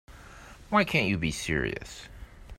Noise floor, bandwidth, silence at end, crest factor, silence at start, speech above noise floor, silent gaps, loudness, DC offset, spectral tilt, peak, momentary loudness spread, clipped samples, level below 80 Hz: -48 dBFS; 16 kHz; 0 s; 22 dB; 0.1 s; 20 dB; none; -28 LUFS; under 0.1%; -5 dB/octave; -8 dBFS; 24 LU; under 0.1%; -46 dBFS